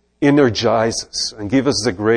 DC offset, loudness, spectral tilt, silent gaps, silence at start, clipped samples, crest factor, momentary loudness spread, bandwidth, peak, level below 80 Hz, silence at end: under 0.1%; -17 LUFS; -4.5 dB/octave; none; 0.2 s; under 0.1%; 14 dB; 7 LU; 10.5 kHz; -2 dBFS; -48 dBFS; 0 s